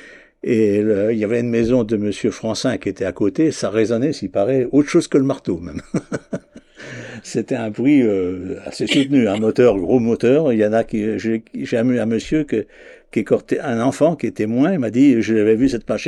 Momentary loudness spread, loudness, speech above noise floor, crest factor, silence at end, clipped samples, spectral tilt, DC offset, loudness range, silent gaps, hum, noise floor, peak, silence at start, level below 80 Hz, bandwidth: 11 LU; -18 LUFS; 20 dB; 16 dB; 0 s; under 0.1%; -6.5 dB/octave; under 0.1%; 4 LU; none; none; -37 dBFS; -2 dBFS; 0 s; -48 dBFS; 11.5 kHz